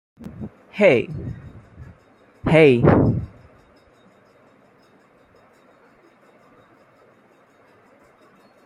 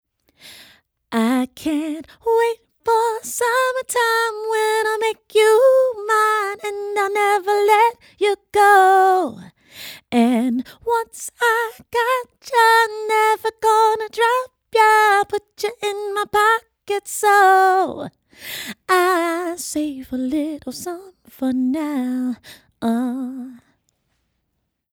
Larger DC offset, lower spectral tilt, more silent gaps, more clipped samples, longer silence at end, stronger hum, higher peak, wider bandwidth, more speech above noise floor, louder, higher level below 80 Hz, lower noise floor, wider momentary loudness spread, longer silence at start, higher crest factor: neither; first, -8.5 dB/octave vs -2.5 dB/octave; neither; neither; first, 5.4 s vs 1.35 s; neither; about the same, -2 dBFS vs -2 dBFS; second, 11 kHz vs over 20 kHz; second, 39 dB vs 56 dB; about the same, -17 LUFS vs -18 LUFS; first, -46 dBFS vs -62 dBFS; second, -55 dBFS vs -74 dBFS; first, 25 LU vs 14 LU; second, 0.2 s vs 0.45 s; about the same, 22 dB vs 18 dB